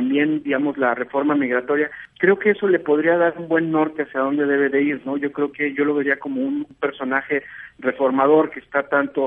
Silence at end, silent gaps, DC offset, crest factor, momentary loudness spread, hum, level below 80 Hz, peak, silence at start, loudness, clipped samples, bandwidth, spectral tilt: 0 s; none; under 0.1%; 16 dB; 8 LU; none; -64 dBFS; -4 dBFS; 0 s; -20 LUFS; under 0.1%; 3.8 kHz; -9 dB/octave